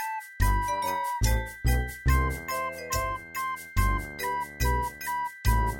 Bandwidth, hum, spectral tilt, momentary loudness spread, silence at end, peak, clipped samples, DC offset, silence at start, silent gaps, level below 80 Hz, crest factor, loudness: 18.5 kHz; none; -4.5 dB/octave; 5 LU; 0 s; -12 dBFS; under 0.1%; under 0.1%; 0 s; none; -30 dBFS; 16 dB; -29 LUFS